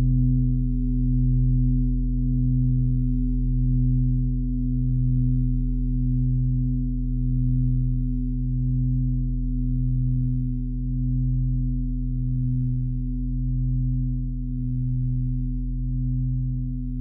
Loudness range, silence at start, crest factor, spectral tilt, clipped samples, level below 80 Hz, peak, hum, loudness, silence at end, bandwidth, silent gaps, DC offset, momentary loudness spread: 3 LU; 0 s; 10 dB; -27 dB/octave; under 0.1%; -26 dBFS; -12 dBFS; none; -25 LUFS; 0 s; 0.4 kHz; none; under 0.1%; 6 LU